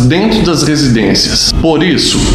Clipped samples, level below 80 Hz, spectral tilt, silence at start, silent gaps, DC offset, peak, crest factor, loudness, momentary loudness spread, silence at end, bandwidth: under 0.1%; -22 dBFS; -4.5 dB/octave; 0 s; none; under 0.1%; 0 dBFS; 10 dB; -9 LUFS; 1 LU; 0 s; 15 kHz